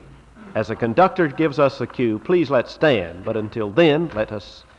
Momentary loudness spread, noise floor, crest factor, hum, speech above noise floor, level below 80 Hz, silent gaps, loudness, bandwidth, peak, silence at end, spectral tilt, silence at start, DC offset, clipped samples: 9 LU; -43 dBFS; 16 dB; none; 24 dB; -50 dBFS; none; -20 LUFS; 8 kHz; -4 dBFS; 0.2 s; -7.5 dB/octave; 0.4 s; under 0.1%; under 0.1%